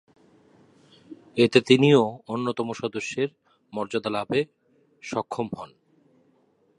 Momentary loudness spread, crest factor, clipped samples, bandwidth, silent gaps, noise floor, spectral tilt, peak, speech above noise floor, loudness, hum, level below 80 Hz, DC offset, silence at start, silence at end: 17 LU; 24 dB; under 0.1%; 11 kHz; none; -64 dBFS; -6 dB/octave; -2 dBFS; 41 dB; -24 LUFS; none; -68 dBFS; under 0.1%; 1.1 s; 1.1 s